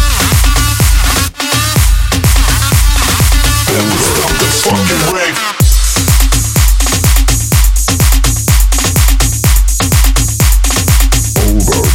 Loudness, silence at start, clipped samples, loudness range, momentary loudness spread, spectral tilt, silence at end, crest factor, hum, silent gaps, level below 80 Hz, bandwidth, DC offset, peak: -10 LUFS; 0 s; under 0.1%; 0 LU; 2 LU; -3.5 dB/octave; 0 s; 8 dB; none; none; -10 dBFS; 17 kHz; under 0.1%; 0 dBFS